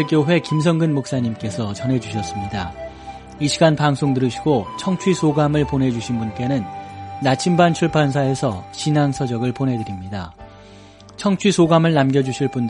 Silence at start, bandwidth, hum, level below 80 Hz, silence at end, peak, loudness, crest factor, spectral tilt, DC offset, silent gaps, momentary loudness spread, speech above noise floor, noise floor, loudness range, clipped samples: 0 s; 11 kHz; none; -46 dBFS; 0 s; -2 dBFS; -19 LUFS; 18 dB; -6 dB/octave; under 0.1%; none; 13 LU; 24 dB; -43 dBFS; 3 LU; under 0.1%